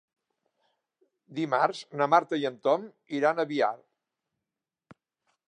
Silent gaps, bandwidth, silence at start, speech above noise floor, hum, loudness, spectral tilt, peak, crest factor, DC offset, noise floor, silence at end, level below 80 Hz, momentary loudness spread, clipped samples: none; 10 kHz; 1.3 s; 62 dB; none; -27 LUFS; -5.5 dB/octave; -8 dBFS; 24 dB; under 0.1%; -89 dBFS; 1.75 s; -86 dBFS; 11 LU; under 0.1%